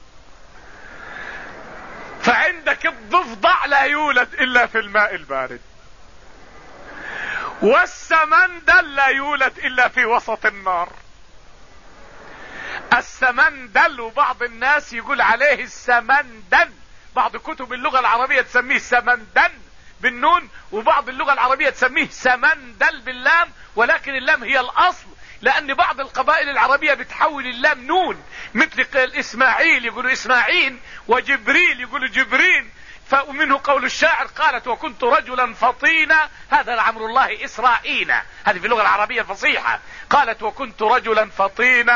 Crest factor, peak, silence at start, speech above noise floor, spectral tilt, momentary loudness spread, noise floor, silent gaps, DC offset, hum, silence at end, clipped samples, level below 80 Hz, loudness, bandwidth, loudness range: 16 dB; -4 dBFS; 0.75 s; 27 dB; -2.5 dB/octave; 11 LU; -45 dBFS; none; 0.6%; none; 0 s; under 0.1%; -48 dBFS; -17 LUFS; 7.4 kHz; 4 LU